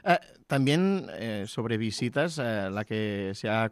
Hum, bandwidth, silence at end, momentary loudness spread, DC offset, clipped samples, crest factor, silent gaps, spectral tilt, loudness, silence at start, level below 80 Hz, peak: none; 14.5 kHz; 0 s; 8 LU; under 0.1%; under 0.1%; 18 dB; none; -6 dB/octave; -29 LUFS; 0.05 s; -68 dBFS; -10 dBFS